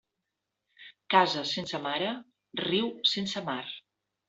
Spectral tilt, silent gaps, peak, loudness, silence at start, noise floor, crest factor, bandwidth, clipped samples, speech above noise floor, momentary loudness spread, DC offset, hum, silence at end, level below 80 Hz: -4 dB/octave; none; -6 dBFS; -29 LUFS; 0.8 s; -85 dBFS; 26 dB; 8 kHz; under 0.1%; 56 dB; 16 LU; under 0.1%; none; 0.5 s; -74 dBFS